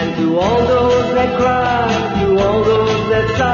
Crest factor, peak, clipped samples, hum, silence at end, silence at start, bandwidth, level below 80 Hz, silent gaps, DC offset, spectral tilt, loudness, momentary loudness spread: 12 dB; -2 dBFS; under 0.1%; none; 0 s; 0 s; 7.2 kHz; -34 dBFS; none; under 0.1%; -6 dB/octave; -14 LUFS; 3 LU